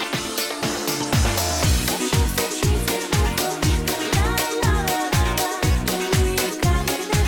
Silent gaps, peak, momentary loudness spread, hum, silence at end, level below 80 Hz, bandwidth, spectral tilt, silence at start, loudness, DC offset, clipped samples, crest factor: none; -8 dBFS; 3 LU; none; 0 s; -26 dBFS; 19 kHz; -4 dB/octave; 0 s; -21 LUFS; under 0.1%; under 0.1%; 14 dB